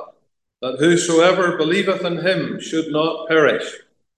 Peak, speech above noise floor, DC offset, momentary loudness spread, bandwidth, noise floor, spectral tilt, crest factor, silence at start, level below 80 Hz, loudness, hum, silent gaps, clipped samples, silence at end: 0 dBFS; 42 dB; under 0.1%; 10 LU; 11.5 kHz; -59 dBFS; -4.5 dB/octave; 18 dB; 0 s; -68 dBFS; -18 LUFS; none; none; under 0.1%; 0.4 s